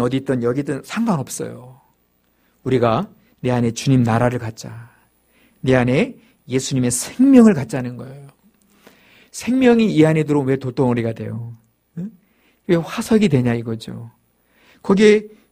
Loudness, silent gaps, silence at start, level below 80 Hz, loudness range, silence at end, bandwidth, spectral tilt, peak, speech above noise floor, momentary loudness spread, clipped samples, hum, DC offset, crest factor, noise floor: -18 LUFS; none; 0 s; -50 dBFS; 5 LU; 0.25 s; 15.5 kHz; -6 dB/octave; 0 dBFS; 45 dB; 19 LU; under 0.1%; none; under 0.1%; 18 dB; -62 dBFS